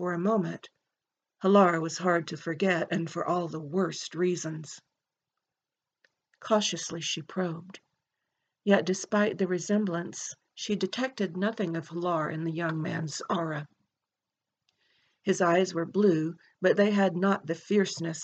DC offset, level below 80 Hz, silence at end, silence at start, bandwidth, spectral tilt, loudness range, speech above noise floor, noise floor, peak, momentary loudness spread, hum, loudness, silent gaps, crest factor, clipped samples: under 0.1%; -82 dBFS; 0 s; 0 s; 8.8 kHz; -5 dB/octave; 6 LU; over 62 dB; under -90 dBFS; -10 dBFS; 12 LU; none; -29 LUFS; none; 20 dB; under 0.1%